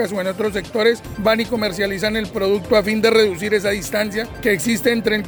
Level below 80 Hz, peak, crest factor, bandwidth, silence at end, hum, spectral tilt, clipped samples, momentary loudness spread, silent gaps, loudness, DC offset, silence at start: -44 dBFS; -2 dBFS; 16 dB; over 20 kHz; 0 s; none; -4 dB/octave; under 0.1%; 6 LU; none; -19 LUFS; under 0.1%; 0 s